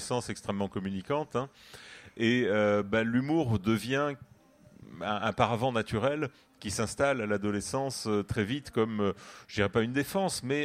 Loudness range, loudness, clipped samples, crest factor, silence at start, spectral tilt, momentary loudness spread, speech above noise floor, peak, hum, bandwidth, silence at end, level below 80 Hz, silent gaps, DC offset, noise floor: 2 LU; -30 LUFS; under 0.1%; 22 dB; 0 s; -5.5 dB/octave; 11 LU; 27 dB; -10 dBFS; none; 16 kHz; 0 s; -58 dBFS; none; under 0.1%; -58 dBFS